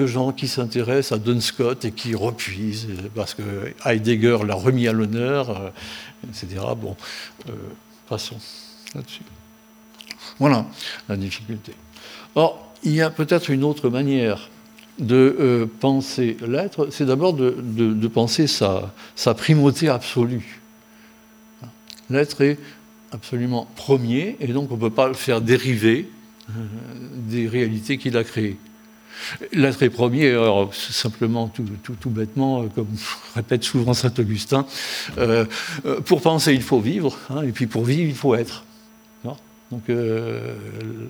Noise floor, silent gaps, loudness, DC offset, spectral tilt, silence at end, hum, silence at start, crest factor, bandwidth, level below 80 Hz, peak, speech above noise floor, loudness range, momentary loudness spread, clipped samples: -49 dBFS; none; -21 LUFS; under 0.1%; -6 dB/octave; 0 s; none; 0 s; 22 dB; over 20 kHz; -56 dBFS; 0 dBFS; 28 dB; 7 LU; 17 LU; under 0.1%